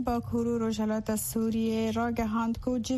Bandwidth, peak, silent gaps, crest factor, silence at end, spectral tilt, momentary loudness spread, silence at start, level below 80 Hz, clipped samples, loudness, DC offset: 13.5 kHz; -16 dBFS; none; 12 dB; 0 s; -5.5 dB/octave; 2 LU; 0 s; -48 dBFS; under 0.1%; -30 LUFS; under 0.1%